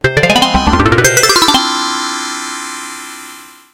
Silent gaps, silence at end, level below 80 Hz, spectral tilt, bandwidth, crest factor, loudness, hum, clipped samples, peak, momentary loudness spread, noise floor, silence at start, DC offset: none; 0.25 s; -28 dBFS; -3 dB/octave; 17.5 kHz; 12 dB; -10 LUFS; none; under 0.1%; 0 dBFS; 18 LU; -34 dBFS; 0.05 s; under 0.1%